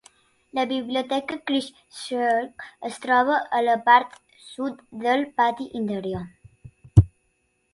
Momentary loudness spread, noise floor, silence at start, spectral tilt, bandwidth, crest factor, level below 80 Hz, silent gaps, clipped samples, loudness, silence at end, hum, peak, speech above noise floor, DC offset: 16 LU; -70 dBFS; 0.55 s; -6.5 dB/octave; 11.5 kHz; 24 dB; -40 dBFS; none; under 0.1%; -23 LUFS; 0.65 s; none; -2 dBFS; 46 dB; under 0.1%